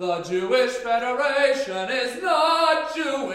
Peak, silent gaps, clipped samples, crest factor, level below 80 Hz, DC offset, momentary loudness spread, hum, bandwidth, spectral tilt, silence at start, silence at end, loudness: -8 dBFS; none; under 0.1%; 14 dB; -62 dBFS; under 0.1%; 6 LU; none; 15 kHz; -3 dB/octave; 0 s; 0 s; -22 LUFS